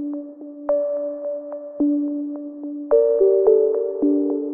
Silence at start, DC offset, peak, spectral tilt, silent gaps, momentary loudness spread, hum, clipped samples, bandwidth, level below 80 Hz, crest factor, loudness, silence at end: 0 s; under 0.1%; -4 dBFS; -10 dB/octave; none; 16 LU; none; under 0.1%; 2 kHz; -62 dBFS; 16 dB; -20 LUFS; 0 s